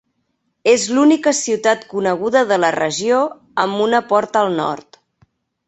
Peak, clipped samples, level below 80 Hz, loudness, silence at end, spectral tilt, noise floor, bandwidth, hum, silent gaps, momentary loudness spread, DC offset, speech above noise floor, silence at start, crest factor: -2 dBFS; under 0.1%; -62 dBFS; -16 LUFS; 0.85 s; -3.5 dB/octave; -69 dBFS; 8.2 kHz; none; none; 8 LU; under 0.1%; 53 dB; 0.65 s; 16 dB